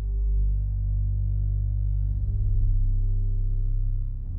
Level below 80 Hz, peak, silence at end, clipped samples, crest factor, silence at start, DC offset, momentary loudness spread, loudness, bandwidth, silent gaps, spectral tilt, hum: -24 dBFS; -14 dBFS; 0 s; under 0.1%; 10 dB; 0 s; under 0.1%; 3 LU; -28 LUFS; 0.8 kHz; none; -13.5 dB/octave; 50 Hz at -30 dBFS